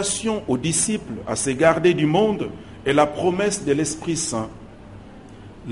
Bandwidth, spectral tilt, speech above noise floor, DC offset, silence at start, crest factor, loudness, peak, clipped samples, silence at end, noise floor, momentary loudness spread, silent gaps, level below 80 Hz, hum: 11.5 kHz; -4 dB/octave; 20 dB; 0.2%; 0 s; 20 dB; -21 LUFS; -2 dBFS; under 0.1%; 0 s; -41 dBFS; 11 LU; none; -48 dBFS; none